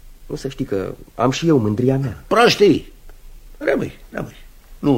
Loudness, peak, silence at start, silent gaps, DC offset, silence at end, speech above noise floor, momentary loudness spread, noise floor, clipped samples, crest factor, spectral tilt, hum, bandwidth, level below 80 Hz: -18 LUFS; 0 dBFS; 0.05 s; none; under 0.1%; 0 s; 21 dB; 17 LU; -39 dBFS; under 0.1%; 18 dB; -6 dB/octave; none; 16.5 kHz; -40 dBFS